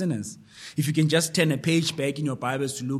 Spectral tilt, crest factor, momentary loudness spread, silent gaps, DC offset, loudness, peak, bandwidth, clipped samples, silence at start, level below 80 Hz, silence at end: -5 dB/octave; 18 dB; 11 LU; none; under 0.1%; -25 LUFS; -8 dBFS; 14.5 kHz; under 0.1%; 0 s; -66 dBFS; 0 s